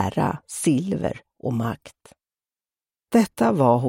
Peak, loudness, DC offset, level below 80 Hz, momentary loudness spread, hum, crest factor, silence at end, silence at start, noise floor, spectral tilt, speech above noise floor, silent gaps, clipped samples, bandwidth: -6 dBFS; -23 LUFS; under 0.1%; -54 dBFS; 11 LU; none; 18 dB; 0 s; 0 s; under -90 dBFS; -6.5 dB/octave; over 68 dB; none; under 0.1%; 16.5 kHz